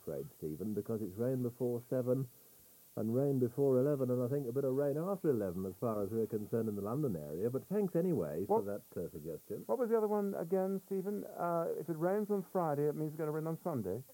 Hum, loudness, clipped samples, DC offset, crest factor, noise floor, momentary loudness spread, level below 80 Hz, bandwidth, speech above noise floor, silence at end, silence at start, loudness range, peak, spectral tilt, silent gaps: none; -37 LUFS; under 0.1%; under 0.1%; 16 dB; -61 dBFS; 9 LU; -74 dBFS; 17 kHz; 26 dB; 0 s; 0.05 s; 2 LU; -20 dBFS; -9 dB/octave; none